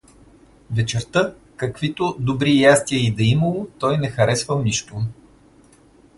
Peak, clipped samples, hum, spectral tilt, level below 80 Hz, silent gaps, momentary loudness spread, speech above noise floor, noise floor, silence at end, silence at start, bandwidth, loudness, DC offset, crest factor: -2 dBFS; under 0.1%; none; -5 dB/octave; -48 dBFS; none; 13 LU; 32 dB; -51 dBFS; 1.05 s; 0.7 s; 11.5 kHz; -20 LUFS; under 0.1%; 20 dB